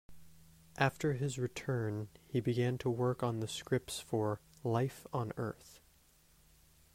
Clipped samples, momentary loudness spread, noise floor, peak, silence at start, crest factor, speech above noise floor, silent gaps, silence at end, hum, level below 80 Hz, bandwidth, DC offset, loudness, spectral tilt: under 0.1%; 7 LU; -67 dBFS; -16 dBFS; 0.1 s; 22 dB; 31 dB; none; 1.2 s; none; -66 dBFS; 16 kHz; under 0.1%; -37 LUFS; -6 dB/octave